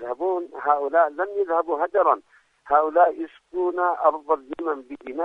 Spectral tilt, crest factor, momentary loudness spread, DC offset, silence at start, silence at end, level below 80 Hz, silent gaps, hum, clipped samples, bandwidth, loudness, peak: -6 dB/octave; 18 dB; 9 LU; under 0.1%; 0 s; 0 s; -68 dBFS; none; none; under 0.1%; 3.9 kHz; -23 LUFS; -6 dBFS